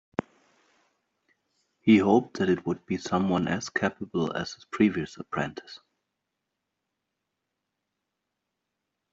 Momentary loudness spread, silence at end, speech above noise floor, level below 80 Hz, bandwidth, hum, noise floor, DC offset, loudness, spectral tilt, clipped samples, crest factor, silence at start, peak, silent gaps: 15 LU; 3.35 s; 57 dB; -66 dBFS; 7.8 kHz; none; -83 dBFS; under 0.1%; -27 LUFS; -6 dB/octave; under 0.1%; 22 dB; 0.2 s; -8 dBFS; none